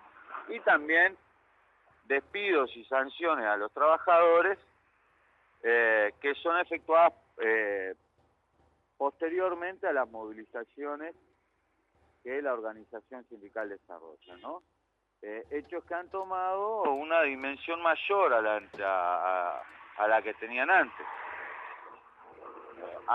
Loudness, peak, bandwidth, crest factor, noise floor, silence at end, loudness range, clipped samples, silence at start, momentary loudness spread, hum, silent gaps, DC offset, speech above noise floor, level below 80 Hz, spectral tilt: -29 LUFS; -12 dBFS; 5.6 kHz; 18 dB; -77 dBFS; 0 s; 13 LU; under 0.1%; 0.3 s; 21 LU; none; none; under 0.1%; 48 dB; -76 dBFS; -5.5 dB/octave